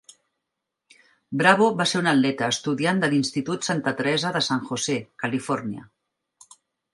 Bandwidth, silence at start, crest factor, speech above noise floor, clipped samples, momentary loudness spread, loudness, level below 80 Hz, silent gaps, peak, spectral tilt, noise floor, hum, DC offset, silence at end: 11.5 kHz; 1.3 s; 22 dB; 60 dB; under 0.1%; 9 LU; -23 LUFS; -68 dBFS; none; -2 dBFS; -4 dB/octave; -83 dBFS; none; under 0.1%; 1.1 s